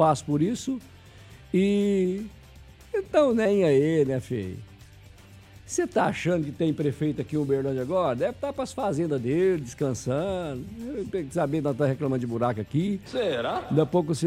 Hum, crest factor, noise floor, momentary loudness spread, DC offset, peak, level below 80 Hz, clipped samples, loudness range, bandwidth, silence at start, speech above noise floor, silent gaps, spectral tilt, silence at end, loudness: none; 18 dB; -49 dBFS; 10 LU; under 0.1%; -8 dBFS; -54 dBFS; under 0.1%; 3 LU; 15 kHz; 0 s; 24 dB; none; -6.5 dB/octave; 0 s; -26 LUFS